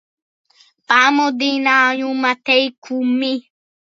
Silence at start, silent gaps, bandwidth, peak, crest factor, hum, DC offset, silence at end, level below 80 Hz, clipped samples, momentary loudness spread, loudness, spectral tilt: 0.9 s; 2.78-2.82 s; 7.6 kHz; 0 dBFS; 18 dB; none; under 0.1%; 0.6 s; -78 dBFS; under 0.1%; 9 LU; -16 LUFS; -2 dB/octave